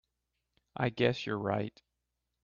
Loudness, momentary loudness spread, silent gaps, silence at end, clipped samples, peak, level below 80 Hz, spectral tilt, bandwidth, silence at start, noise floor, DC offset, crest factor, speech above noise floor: -33 LUFS; 11 LU; none; 0.75 s; under 0.1%; -14 dBFS; -68 dBFS; -7 dB/octave; 7.4 kHz; 0.8 s; -85 dBFS; under 0.1%; 22 dB; 53 dB